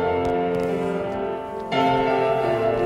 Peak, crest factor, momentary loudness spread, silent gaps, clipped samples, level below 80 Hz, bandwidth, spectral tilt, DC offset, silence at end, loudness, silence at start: -8 dBFS; 14 dB; 7 LU; none; under 0.1%; -48 dBFS; 12 kHz; -7 dB/octave; under 0.1%; 0 s; -23 LUFS; 0 s